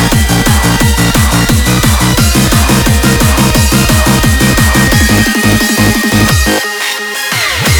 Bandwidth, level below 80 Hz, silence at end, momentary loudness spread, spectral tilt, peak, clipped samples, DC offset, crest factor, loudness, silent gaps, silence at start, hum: over 20 kHz; -16 dBFS; 0 s; 3 LU; -4 dB/octave; 0 dBFS; 0.3%; 0.5%; 8 dB; -8 LUFS; none; 0 s; none